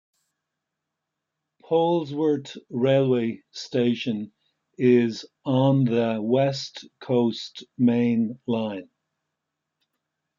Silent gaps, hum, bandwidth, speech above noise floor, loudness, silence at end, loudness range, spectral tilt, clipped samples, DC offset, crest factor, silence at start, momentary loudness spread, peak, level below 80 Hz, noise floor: none; none; 7.4 kHz; 60 dB; -24 LUFS; 1.55 s; 3 LU; -7.5 dB/octave; under 0.1%; under 0.1%; 18 dB; 1.7 s; 13 LU; -8 dBFS; -74 dBFS; -83 dBFS